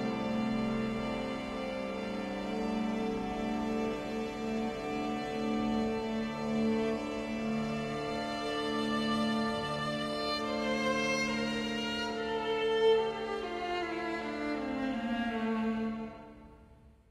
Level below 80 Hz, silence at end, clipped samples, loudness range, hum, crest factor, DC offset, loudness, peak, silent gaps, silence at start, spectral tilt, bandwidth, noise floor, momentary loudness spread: -56 dBFS; 0.2 s; under 0.1%; 4 LU; none; 16 dB; under 0.1%; -34 LUFS; -18 dBFS; none; 0 s; -5 dB/octave; 12.5 kHz; -58 dBFS; 6 LU